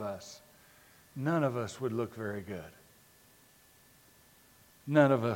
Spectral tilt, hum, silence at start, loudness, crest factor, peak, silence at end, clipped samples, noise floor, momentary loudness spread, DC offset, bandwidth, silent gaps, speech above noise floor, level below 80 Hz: -7 dB/octave; none; 0 s; -32 LUFS; 24 dB; -10 dBFS; 0 s; under 0.1%; -62 dBFS; 23 LU; under 0.1%; 17 kHz; none; 31 dB; -72 dBFS